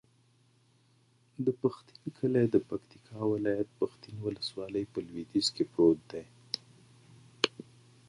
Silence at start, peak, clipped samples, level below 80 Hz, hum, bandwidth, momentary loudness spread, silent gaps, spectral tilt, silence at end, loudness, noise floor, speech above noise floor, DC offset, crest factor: 1.4 s; -6 dBFS; under 0.1%; -68 dBFS; none; 11.5 kHz; 18 LU; none; -5.5 dB/octave; 0.45 s; -32 LUFS; -67 dBFS; 35 dB; under 0.1%; 26 dB